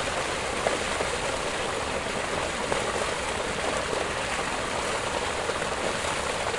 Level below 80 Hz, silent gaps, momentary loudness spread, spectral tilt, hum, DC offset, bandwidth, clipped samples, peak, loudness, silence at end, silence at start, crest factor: -46 dBFS; none; 2 LU; -2.5 dB/octave; none; 0.2%; 11.5 kHz; under 0.1%; -8 dBFS; -28 LUFS; 0 s; 0 s; 22 dB